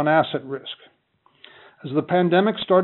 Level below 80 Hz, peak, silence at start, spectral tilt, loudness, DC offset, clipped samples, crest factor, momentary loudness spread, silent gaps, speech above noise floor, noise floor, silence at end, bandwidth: -70 dBFS; -4 dBFS; 0 s; -4.5 dB/octave; -21 LUFS; under 0.1%; under 0.1%; 18 dB; 19 LU; none; 42 dB; -62 dBFS; 0 s; 4.2 kHz